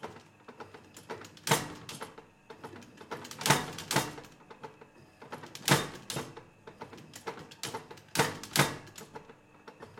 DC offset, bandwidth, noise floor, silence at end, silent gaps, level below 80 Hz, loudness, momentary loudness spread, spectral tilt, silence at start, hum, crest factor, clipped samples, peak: under 0.1%; 16.5 kHz; -56 dBFS; 0.05 s; none; -66 dBFS; -33 LUFS; 23 LU; -3 dB/octave; 0 s; none; 30 dB; under 0.1%; -6 dBFS